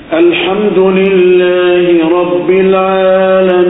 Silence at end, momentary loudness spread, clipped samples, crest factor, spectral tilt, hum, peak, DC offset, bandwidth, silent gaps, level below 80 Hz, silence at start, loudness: 0 s; 3 LU; under 0.1%; 8 dB; -10 dB/octave; none; 0 dBFS; under 0.1%; 4 kHz; none; -46 dBFS; 0 s; -8 LUFS